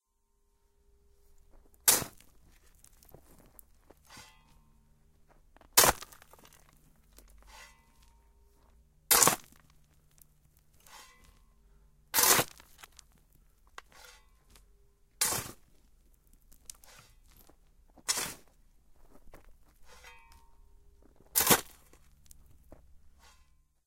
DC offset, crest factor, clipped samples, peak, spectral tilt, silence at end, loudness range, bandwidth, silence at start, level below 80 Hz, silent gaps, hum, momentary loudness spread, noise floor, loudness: under 0.1%; 34 dB; under 0.1%; -4 dBFS; -0.5 dB/octave; 1.1 s; 10 LU; 16.5 kHz; 1.85 s; -60 dBFS; none; none; 30 LU; -74 dBFS; -26 LUFS